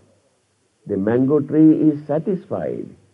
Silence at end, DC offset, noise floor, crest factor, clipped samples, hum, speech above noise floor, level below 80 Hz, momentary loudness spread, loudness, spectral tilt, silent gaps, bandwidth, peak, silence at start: 0.3 s; under 0.1%; -64 dBFS; 16 dB; under 0.1%; none; 46 dB; -58 dBFS; 13 LU; -18 LUFS; -11 dB/octave; none; 3.5 kHz; -4 dBFS; 0.85 s